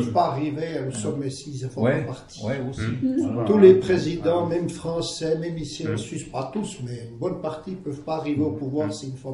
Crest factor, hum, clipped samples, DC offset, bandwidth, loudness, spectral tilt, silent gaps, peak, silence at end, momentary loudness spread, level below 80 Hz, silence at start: 22 dB; none; under 0.1%; under 0.1%; 11.5 kHz; -24 LUFS; -6.5 dB/octave; none; -2 dBFS; 0 s; 12 LU; -52 dBFS; 0 s